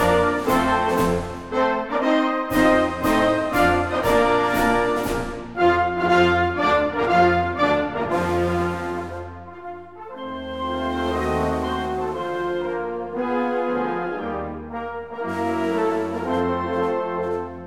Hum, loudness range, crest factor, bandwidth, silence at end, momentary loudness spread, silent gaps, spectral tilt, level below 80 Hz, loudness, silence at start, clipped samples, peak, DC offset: none; 7 LU; 16 dB; 19 kHz; 0 s; 12 LU; none; -6 dB/octave; -40 dBFS; -22 LUFS; 0 s; under 0.1%; -4 dBFS; 0.3%